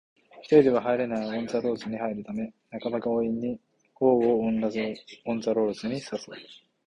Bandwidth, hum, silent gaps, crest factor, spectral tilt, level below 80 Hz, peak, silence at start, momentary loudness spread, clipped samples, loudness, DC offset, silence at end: 10 kHz; none; none; 20 dB; -6.5 dB/octave; -64 dBFS; -6 dBFS; 0.35 s; 15 LU; under 0.1%; -27 LUFS; under 0.1%; 0.3 s